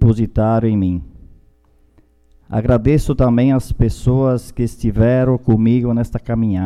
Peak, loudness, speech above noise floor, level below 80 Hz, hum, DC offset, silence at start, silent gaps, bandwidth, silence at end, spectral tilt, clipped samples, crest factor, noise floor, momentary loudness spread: -2 dBFS; -16 LUFS; 38 dB; -28 dBFS; none; under 0.1%; 0 s; none; 12.5 kHz; 0 s; -9 dB/octave; under 0.1%; 14 dB; -52 dBFS; 6 LU